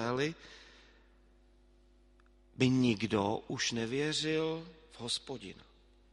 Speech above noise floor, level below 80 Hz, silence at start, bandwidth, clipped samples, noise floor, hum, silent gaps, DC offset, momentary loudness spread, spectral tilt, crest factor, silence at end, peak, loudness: 30 dB; -64 dBFS; 0 s; 11.5 kHz; under 0.1%; -64 dBFS; none; none; under 0.1%; 20 LU; -4.5 dB/octave; 24 dB; 0.5 s; -12 dBFS; -34 LUFS